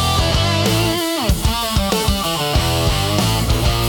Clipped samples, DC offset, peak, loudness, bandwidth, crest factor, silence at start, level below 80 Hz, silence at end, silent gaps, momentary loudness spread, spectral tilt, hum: under 0.1%; under 0.1%; -2 dBFS; -17 LUFS; 18 kHz; 14 dB; 0 s; -24 dBFS; 0 s; none; 2 LU; -4.5 dB/octave; none